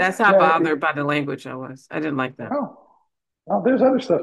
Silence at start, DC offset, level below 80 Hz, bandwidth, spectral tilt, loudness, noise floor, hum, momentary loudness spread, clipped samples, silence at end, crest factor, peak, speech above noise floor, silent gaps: 0 s; under 0.1%; -68 dBFS; 12.5 kHz; -6.5 dB/octave; -20 LUFS; -69 dBFS; none; 16 LU; under 0.1%; 0 s; 18 dB; -2 dBFS; 49 dB; none